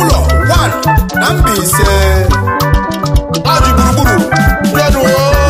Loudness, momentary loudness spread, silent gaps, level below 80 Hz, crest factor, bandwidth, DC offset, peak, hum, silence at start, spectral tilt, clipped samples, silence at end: -10 LUFS; 3 LU; none; -14 dBFS; 8 dB; 15.5 kHz; under 0.1%; 0 dBFS; none; 0 s; -5 dB/octave; under 0.1%; 0 s